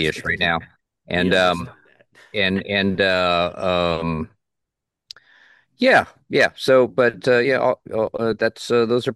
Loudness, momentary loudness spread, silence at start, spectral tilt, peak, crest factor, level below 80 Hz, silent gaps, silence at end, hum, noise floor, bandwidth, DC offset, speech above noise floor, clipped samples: -19 LUFS; 10 LU; 0 s; -5 dB/octave; -4 dBFS; 18 dB; -50 dBFS; none; 0 s; none; -82 dBFS; 12.5 kHz; under 0.1%; 63 dB; under 0.1%